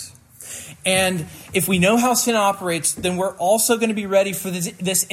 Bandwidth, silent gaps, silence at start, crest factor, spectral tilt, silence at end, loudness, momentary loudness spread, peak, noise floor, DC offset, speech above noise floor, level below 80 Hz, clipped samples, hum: 16.5 kHz; none; 0 s; 16 dB; -3.5 dB/octave; 0 s; -19 LUFS; 13 LU; -4 dBFS; -39 dBFS; under 0.1%; 20 dB; -56 dBFS; under 0.1%; none